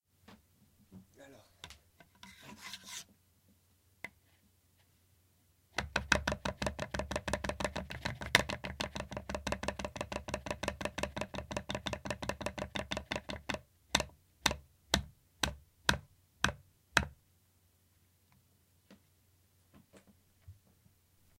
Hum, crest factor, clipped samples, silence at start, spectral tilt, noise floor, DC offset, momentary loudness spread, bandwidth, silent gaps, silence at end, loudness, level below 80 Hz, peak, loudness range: none; 34 dB; under 0.1%; 0.3 s; -3 dB/octave; -71 dBFS; under 0.1%; 21 LU; 16.5 kHz; none; 0.85 s; -37 LUFS; -52 dBFS; -6 dBFS; 16 LU